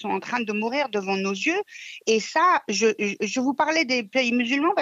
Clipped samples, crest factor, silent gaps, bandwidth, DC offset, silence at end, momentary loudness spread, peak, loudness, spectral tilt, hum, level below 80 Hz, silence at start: under 0.1%; 14 dB; none; 8 kHz; under 0.1%; 0 s; 6 LU; -8 dBFS; -23 LUFS; -3.5 dB/octave; none; -78 dBFS; 0 s